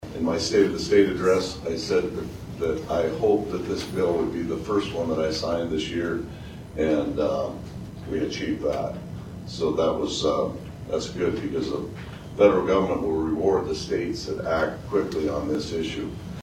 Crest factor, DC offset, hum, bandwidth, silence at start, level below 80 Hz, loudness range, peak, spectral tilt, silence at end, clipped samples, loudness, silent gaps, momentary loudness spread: 20 dB; under 0.1%; none; 16 kHz; 0 s; -46 dBFS; 4 LU; -4 dBFS; -5.5 dB/octave; 0 s; under 0.1%; -25 LUFS; none; 13 LU